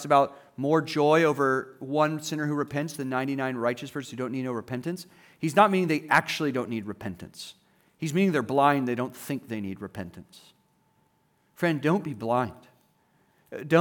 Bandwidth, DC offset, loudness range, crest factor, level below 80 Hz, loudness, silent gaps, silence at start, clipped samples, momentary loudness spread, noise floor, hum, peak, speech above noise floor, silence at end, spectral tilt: over 20 kHz; under 0.1%; 5 LU; 22 dB; -72 dBFS; -27 LUFS; none; 0 s; under 0.1%; 16 LU; -68 dBFS; none; -6 dBFS; 42 dB; 0 s; -6 dB/octave